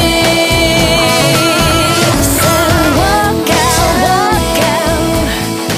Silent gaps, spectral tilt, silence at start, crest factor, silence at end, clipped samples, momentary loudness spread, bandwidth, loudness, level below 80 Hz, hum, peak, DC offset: none; -3.5 dB/octave; 0 s; 10 dB; 0 s; under 0.1%; 3 LU; 16.5 kHz; -10 LUFS; -24 dBFS; none; 0 dBFS; under 0.1%